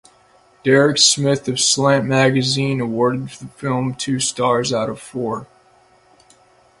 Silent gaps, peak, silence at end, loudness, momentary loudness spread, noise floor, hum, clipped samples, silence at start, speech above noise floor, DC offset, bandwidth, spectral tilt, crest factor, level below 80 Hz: none; 0 dBFS; 1.35 s; -17 LUFS; 13 LU; -53 dBFS; none; under 0.1%; 0.65 s; 36 dB; under 0.1%; 11.5 kHz; -3.5 dB/octave; 18 dB; -56 dBFS